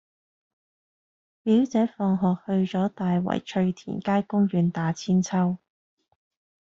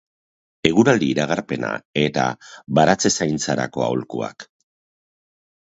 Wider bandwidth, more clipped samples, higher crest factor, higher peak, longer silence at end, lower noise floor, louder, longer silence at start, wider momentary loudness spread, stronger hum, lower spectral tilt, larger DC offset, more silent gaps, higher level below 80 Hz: about the same, 7.6 kHz vs 8 kHz; neither; second, 16 dB vs 22 dB; second, -10 dBFS vs 0 dBFS; second, 1.05 s vs 1.25 s; about the same, under -90 dBFS vs under -90 dBFS; second, -25 LUFS vs -20 LUFS; first, 1.45 s vs 0.65 s; second, 5 LU vs 10 LU; neither; first, -7.5 dB/octave vs -4.5 dB/octave; neither; second, none vs 1.85-1.94 s; second, -64 dBFS vs -54 dBFS